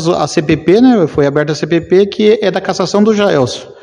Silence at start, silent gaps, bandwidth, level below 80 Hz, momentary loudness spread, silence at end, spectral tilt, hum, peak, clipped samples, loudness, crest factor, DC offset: 0 s; none; 10.5 kHz; -46 dBFS; 6 LU; 0.1 s; -6 dB/octave; none; 0 dBFS; 0.4%; -11 LUFS; 10 dB; under 0.1%